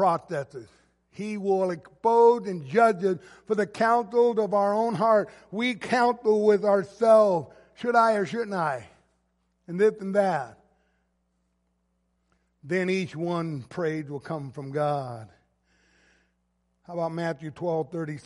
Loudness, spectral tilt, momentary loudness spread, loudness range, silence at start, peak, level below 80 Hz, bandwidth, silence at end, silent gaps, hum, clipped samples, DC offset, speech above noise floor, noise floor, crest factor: -25 LUFS; -6.5 dB/octave; 14 LU; 11 LU; 0 s; -6 dBFS; -70 dBFS; 11.5 kHz; 0.05 s; none; none; under 0.1%; under 0.1%; 48 dB; -73 dBFS; 20 dB